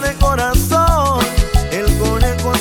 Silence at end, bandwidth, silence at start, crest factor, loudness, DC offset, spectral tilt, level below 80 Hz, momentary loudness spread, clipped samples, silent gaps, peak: 0 s; 19 kHz; 0 s; 14 dB; -15 LUFS; under 0.1%; -5 dB/octave; -18 dBFS; 4 LU; under 0.1%; none; 0 dBFS